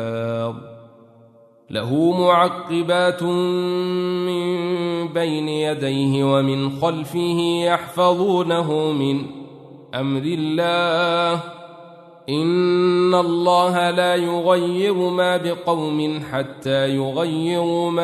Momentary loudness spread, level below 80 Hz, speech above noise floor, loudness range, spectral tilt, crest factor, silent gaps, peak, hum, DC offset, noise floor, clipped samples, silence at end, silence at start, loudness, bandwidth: 9 LU; -64 dBFS; 31 dB; 3 LU; -6 dB/octave; 18 dB; none; -2 dBFS; none; under 0.1%; -50 dBFS; under 0.1%; 0 s; 0 s; -20 LUFS; 13.5 kHz